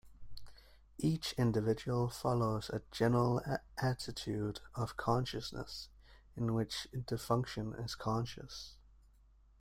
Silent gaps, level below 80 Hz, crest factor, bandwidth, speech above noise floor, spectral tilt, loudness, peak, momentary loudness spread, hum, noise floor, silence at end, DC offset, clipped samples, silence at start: none; -58 dBFS; 18 dB; 16 kHz; 29 dB; -6 dB/octave; -37 LUFS; -20 dBFS; 15 LU; none; -65 dBFS; 0.85 s; under 0.1%; under 0.1%; 0.05 s